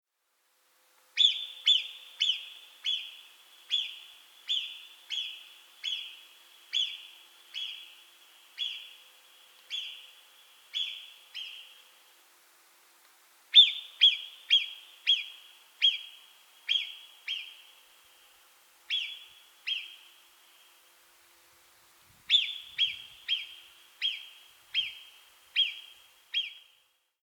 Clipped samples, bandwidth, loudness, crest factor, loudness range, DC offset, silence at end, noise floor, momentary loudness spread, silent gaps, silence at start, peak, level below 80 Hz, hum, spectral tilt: under 0.1%; over 20 kHz; -28 LUFS; 26 dB; 16 LU; under 0.1%; 0.65 s; -75 dBFS; 22 LU; none; 1.15 s; -8 dBFS; -86 dBFS; none; 4 dB/octave